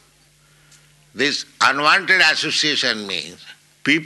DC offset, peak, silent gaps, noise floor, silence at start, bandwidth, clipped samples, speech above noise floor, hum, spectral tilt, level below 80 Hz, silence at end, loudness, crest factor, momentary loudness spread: under 0.1%; -2 dBFS; none; -55 dBFS; 1.15 s; 12 kHz; under 0.1%; 36 dB; none; -1.5 dB/octave; -66 dBFS; 0 s; -17 LUFS; 18 dB; 12 LU